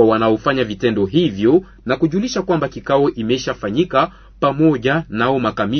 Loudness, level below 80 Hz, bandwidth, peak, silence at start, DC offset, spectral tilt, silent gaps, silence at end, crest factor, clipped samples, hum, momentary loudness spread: -17 LUFS; -44 dBFS; 6.6 kHz; -2 dBFS; 0 s; under 0.1%; -6.5 dB/octave; none; 0 s; 14 dB; under 0.1%; none; 5 LU